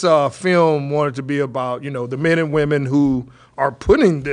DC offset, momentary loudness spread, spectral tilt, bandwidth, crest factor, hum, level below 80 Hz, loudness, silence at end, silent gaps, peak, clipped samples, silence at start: under 0.1%; 9 LU; -7 dB/octave; 10.5 kHz; 14 dB; none; -40 dBFS; -18 LUFS; 0 s; none; -2 dBFS; under 0.1%; 0 s